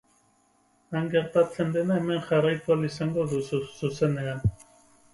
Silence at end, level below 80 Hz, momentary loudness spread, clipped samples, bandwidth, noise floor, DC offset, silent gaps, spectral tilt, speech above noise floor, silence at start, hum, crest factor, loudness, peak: 0.6 s; -52 dBFS; 7 LU; under 0.1%; 11.5 kHz; -66 dBFS; under 0.1%; none; -7 dB/octave; 40 dB; 0.9 s; none; 18 dB; -27 LUFS; -10 dBFS